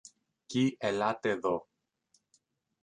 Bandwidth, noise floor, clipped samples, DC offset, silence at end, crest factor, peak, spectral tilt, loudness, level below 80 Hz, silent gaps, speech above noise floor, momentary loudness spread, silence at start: 10 kHz; -74 dBFS; under 0.1%; under 0.1%; 1.2 s; 20 dB; -14 dBFS; -5.5 dB/octave; -32 LUFS; -72 dBFS; none; 44 dB; 6 LU; 0.05 s